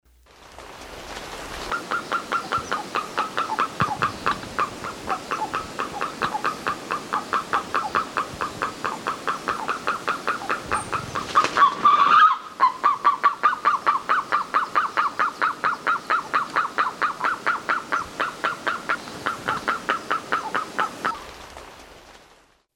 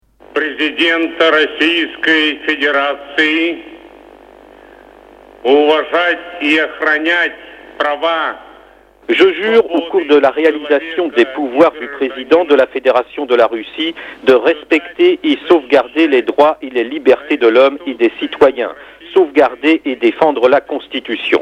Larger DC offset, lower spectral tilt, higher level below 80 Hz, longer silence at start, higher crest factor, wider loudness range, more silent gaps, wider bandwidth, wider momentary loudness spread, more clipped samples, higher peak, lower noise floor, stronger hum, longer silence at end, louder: neither; second, -3 dB/octave vs -4.5 dB/octave; about the same, -54 dBFS vs -56 dBFS; about the same, 0.4 s vs 0.35 s; about the same, 18 dB vs 14 dB; first, 8 LU vs 3 LU; neither; first, 17.5 kHz vs 9.4 kHz; about the same, 10 LU vs 8 LU; second, under 0.1% vs 0.1%; second, -6 dBFS vs 0 dBFS; first, -56 dBFS vs -44 dBFS; neither; first, 0.55 s vs 0 s; second, -23 LUFS vs -13 LUFS